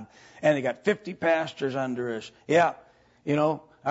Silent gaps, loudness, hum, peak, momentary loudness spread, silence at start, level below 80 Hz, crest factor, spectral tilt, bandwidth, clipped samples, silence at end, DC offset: none; -27 LUFS; none; -8 dBFS; 9 LU; 0 s; -70 dBFS; 18 dB; -6 dB/octave; 8 kHz; under 0.1%; 0 s; under 0.1%